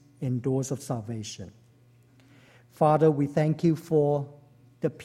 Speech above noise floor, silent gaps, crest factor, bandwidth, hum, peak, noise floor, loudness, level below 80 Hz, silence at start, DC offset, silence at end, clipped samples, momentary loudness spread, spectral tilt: 33 dB; none; 18 dB; 13.5 kHz; none; -8 dBFS; -58 dBFS; -26 LUFS; -64 dBFS; 0.2 s; under 0.1%; 0 s; under 0.1%; 16 LU; -7.5 dB/octave